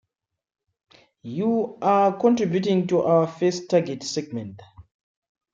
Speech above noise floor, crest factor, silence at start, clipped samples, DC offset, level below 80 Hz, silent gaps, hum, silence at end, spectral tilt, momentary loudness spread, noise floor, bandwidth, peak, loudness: 64 dB; 18 dB; 1.25 s; under 0.1%; under 0.1%; -66 dBFS; none; none; 0.7 s; -6.5 dB/octave; 14 LU; -86 dBFS; 7.8 kHz; -6 dBFS; -22 LUFS